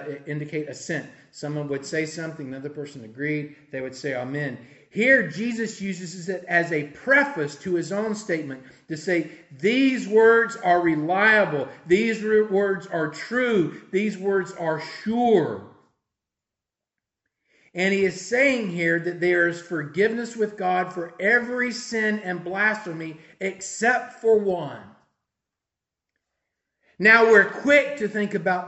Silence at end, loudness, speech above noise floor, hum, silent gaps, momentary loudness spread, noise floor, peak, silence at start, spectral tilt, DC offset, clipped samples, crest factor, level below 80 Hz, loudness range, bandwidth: 0 s; -22 LUFS; 65 dB; none; none; 15 LU; -88 dBFS; -2 dBFS; 0 s; -5 dB/octave; under 0.1%; under 0.1%; 22 dB; -68 dBFS; 8 LU; 8.4 kHz